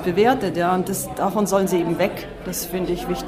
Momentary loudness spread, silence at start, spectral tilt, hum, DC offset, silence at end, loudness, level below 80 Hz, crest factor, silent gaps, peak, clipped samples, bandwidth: 8 LU; 0 s; -5 dB/octave; none; under 0.1%; 0 s; -22 LUFS; -44 dBFS; 16 dB; none; -6 dBFS; under 0.1%; 16 kHz